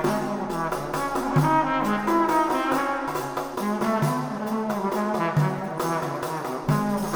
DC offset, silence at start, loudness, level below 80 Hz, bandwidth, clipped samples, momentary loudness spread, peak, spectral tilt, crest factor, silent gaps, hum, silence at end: under 0.1%; 0 s; -25 LUFS; -50 dBFS; over 20 kHz; under 0.1%; 7 LU; -8 dBFS; -6 dB/octave; 16 dB; none; none; 0 s